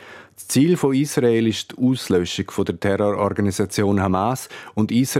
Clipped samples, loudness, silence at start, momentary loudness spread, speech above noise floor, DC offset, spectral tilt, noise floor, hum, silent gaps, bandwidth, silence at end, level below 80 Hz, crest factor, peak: under 0.1%; -20 LUFS; 0 s; 7 LU; 21 dB; under 0.1%; -5.5 dB/octave; -41 dBFS; none; none; 16.5 kHz; 0 s; -58 dBFS; 16 dB; -4 dBFS